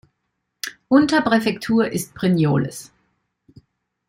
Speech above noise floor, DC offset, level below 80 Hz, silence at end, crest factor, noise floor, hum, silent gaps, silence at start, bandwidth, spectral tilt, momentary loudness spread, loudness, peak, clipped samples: 57 dB; under 0.1%; -56 dBFS; 1.25 s; 18 dB; -75 dBFS; none; none; 0.65 s; 16.5 kHz; -6 dB/octave; 16 LU; -19 LUFS; -4 dBFS; under 0.1%